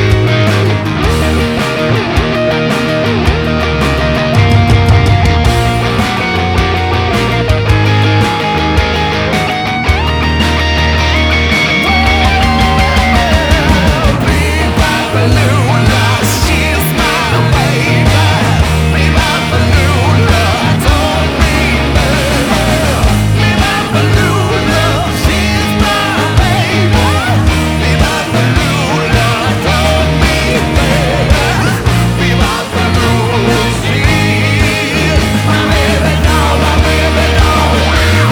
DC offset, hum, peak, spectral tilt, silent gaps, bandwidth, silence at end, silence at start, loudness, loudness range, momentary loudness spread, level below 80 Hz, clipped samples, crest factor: under 0.1%; none; 0 dBFS; -5 dB/octave; none; over 20 kHz; 0 s; 0 s; -10 LUFS; 1 LU; 3 LU; -18 dBFS; 0.2%; 10 dB